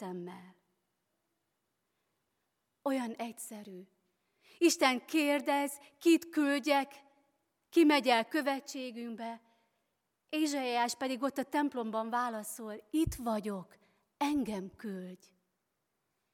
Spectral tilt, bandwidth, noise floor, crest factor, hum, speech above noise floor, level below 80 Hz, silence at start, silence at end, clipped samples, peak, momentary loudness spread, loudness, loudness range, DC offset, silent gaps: -3.5 dB/octave; 17 kHz; -83 dBFS; 24 dB; none; 51 dB; -64 dBFS; 0 s; 1.2 s; under 0.1%; -12 dBFS; 17 LU; -33 LUFS; 12 LU; under 0.1%; none